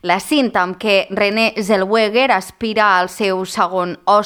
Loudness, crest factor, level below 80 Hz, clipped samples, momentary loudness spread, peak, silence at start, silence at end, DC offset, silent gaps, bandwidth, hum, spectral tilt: -16 LUFS; 14 dB; -54 dBFS; under 0.1%; 5 LU; -2 dBFS; 0.05 s; 0 s; under 0.1%; none; 19.5 kHz; none; -4 dB/octave